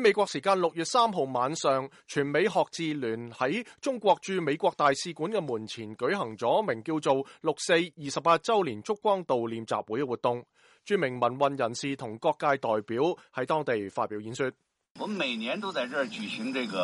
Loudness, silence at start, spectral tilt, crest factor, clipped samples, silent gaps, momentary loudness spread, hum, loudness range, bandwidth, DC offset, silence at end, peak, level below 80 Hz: -29 LUFS; 0 s; -4.5 dB/octave; 18 dB; under 0.1%; 14.90-14.95 s; 8 LU; none; 3 LU; 11.5 kHz; under 0.1%; 0 s; -12 dBFS; -74 dBFS